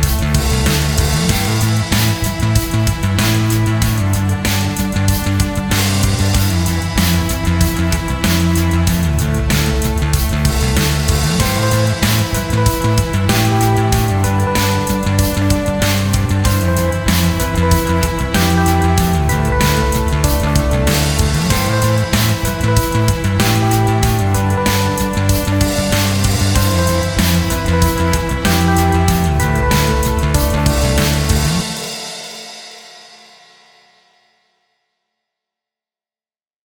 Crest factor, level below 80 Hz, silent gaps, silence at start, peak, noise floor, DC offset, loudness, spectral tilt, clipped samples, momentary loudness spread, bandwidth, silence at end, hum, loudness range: 14 dB; -22 dBFS; none; 0 s; 0 dBFS; under -90 dBFS; under 0.1%; -15 LUFS; -5 dB/octave; under 0.1%; 3 LU; over 20 kHz; 3.65 s; none; 1 LU